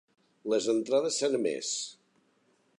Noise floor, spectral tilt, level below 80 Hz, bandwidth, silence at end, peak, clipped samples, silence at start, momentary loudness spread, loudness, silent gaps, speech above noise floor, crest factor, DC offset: -69 dBFS; -2.5 dB/octave; -82 dBFS; 11 kHz; 0.9 s; -16 dBFS; under 0.1%; 0.45 s; 9 LU; -29 LUFS; none; 40 dB; 16 dB; under 0.1%